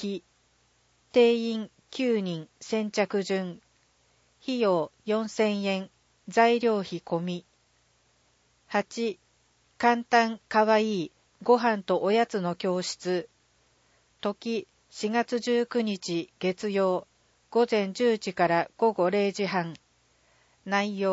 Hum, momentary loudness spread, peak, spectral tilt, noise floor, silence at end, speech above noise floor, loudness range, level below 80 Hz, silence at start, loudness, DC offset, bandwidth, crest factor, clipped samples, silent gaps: none; 12 LU; -8 dBFS; -5 dB/octave; -67 dBFS; 0 s; 41 dB; 5 LU; -74 dBFS; 0 s; -27 LUFS; under 0.1%; 8 kHz; 20 dB; under 0.1%; none